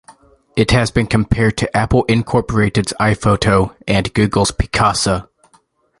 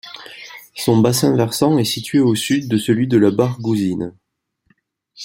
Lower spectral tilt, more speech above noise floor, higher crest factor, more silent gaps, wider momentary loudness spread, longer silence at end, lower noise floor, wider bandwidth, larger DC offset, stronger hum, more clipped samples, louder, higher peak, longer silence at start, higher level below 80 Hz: about the same, -5.5 dB/octave vs -5.5 dB/octave; second, 41 dB vs 55 dB; about the same, 14 dB vs 16 dB; neither; second, 4 LU vs 19 LU; first, 0.75 s vs 0 s; second, -56 dBFS vs -71 dBFS; second, 11.5 kHz vs 16.5 kHz; neither; neither; neither; about the same, -16 LUFS vs -17 LUFS; about the same, 0 dBFS vs -2 dBFS; about the same, 0.1 s vs 0.05 s; first, -30 dBFS vs -56 dBFS